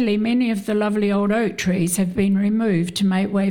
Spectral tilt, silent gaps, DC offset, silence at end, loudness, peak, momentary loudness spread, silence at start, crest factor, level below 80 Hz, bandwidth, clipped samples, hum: -6 dB/octave; none; under 0.1%; 0 s; -20 LUFS; -8 dBFS; 2 LU; 0 s; 10 dB; -50 dBFS; 17 kHz; under 0.1%; none